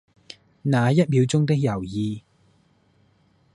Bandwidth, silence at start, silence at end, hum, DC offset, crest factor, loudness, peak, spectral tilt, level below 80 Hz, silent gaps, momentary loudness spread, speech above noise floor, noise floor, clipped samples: 11.5 kHz; 0.65 s; 1.35 s; none; under 0.1%; 18 dB; -22 LUFS; -6 dBFS; -7 dB/octave; -56 dBFS; none; 11 LU; 41 dB; -61 dBFS; under 0.1%